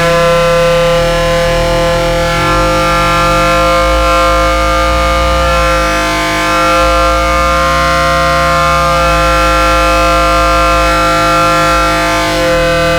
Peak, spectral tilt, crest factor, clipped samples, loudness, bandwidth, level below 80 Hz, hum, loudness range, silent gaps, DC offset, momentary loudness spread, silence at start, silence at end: -2 dBFS; -4 dB/octave; 8 dB; under 0.1%; -9 LUFS; 20 kHz; -18 dBFS; none; 1 LU; none; under 0.1%; 2 LU; 0 s; 0 s